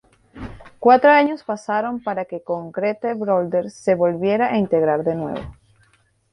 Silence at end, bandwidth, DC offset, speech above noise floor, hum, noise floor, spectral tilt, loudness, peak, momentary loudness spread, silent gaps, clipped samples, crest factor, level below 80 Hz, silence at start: 0.8 s; 10.5 kHz; under 0.1%; 41 dB; none; -60 dBFS; -7 dB/octave; -19 LUFS; -2 dBFS; 17 LU; none; under 0.1%; 18 dB; -52 dBFS; 0.35 s